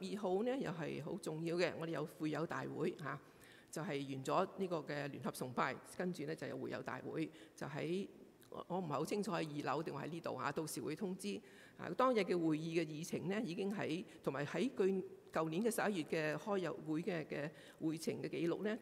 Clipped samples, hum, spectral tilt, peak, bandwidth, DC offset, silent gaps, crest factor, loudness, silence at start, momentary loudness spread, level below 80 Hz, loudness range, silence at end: under 0.1%; none; -5.5 dB/octave; -22 dBFS; 16 kHz; under 0.1%; none; 20 dB; -42 LUFS; 0 s; 9 LU; -80 dBFS; 4 LU; 0 s